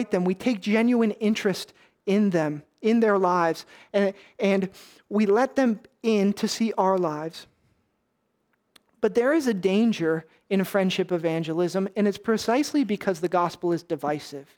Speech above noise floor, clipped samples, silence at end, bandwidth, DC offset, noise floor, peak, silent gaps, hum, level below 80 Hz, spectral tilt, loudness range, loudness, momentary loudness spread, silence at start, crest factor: 50 dB; under 0.1%; 0.15 s; 19 kHz; under 0.1%; -74 dBFS; -8 dBFS; none; none; -70 dBFS; -6 dB/octave; 3 LU; -24 LUFS; 8 LU; 0 s; 16 dB